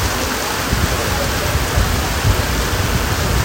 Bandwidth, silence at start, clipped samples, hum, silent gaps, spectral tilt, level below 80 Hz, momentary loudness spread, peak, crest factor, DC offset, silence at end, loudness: 16.5 kHz; 0 s; under 0.1%; none; none; -4 dB/octave; -24 dBFS; 1 LU; -2 dBFS; 16 dB; under 0.1%; 0 s; -17 LUFS